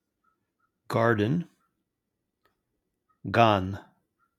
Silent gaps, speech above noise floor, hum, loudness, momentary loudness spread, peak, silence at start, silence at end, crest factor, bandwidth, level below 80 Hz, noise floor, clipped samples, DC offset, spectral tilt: none; 59 dB; none; -25 LUFS; 20 LU; -4 dBFS; 0.9 s; 0.6 s; 24 dB; 14 kHz; -72 dBFS; -83 dBFS; under 0.1%; under 0.1%; -7 dB/octave